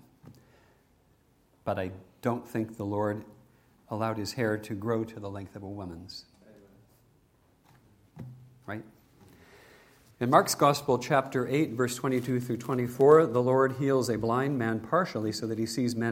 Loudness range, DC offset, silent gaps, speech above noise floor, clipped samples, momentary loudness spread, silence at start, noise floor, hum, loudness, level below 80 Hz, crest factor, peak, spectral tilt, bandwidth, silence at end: 21 LU; under 0.1%; none; 38 dB; under 0.1%; 18 LU; 0.25 s; -65 dBFS; none; -28 LUFS; -66 dBFS; 24 dB; -4 dBFS; -5.5 dB/octave; 16.5 kHz; 0 s